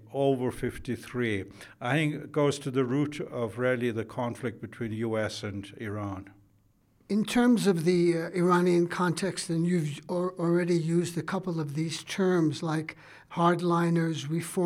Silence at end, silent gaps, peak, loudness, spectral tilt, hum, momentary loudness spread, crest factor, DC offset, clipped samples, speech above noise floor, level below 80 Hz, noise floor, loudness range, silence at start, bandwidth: 0 s; none; -10 dBFS; -29 LUFS; -6 dB/octave; none; 12 LU; 18 dB; under 0.1%; under 0.1%; 37 dB; -60 dBFS; -65 dBFS; 6 LU; 0 s; 15 kHz